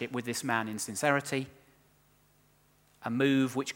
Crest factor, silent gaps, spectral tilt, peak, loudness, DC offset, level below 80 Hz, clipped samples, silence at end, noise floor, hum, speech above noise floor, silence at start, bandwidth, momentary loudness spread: 22 dB; none; -4.5 dB/octave; -10 dBFS; -31 LUFS; under 0.1%; -74 dBFS; under 0.1%; 0.05 s; -66 dBFS; 50 Hz at -70 dBFS; 35 dB; 0 s; 17.5 kHz; 9 LU